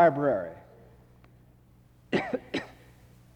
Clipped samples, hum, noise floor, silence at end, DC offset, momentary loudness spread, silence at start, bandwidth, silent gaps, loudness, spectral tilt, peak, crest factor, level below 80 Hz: under 0.1%; 60 Hz at -65 dBFS; -58 dBFS; 0.65 s; under 0.1%; 19 LU; 0 s; 9.4 kHz; none; -30 LUFS; -7 dB/octave; -10 dBFS; 20 dB; -62 dBFS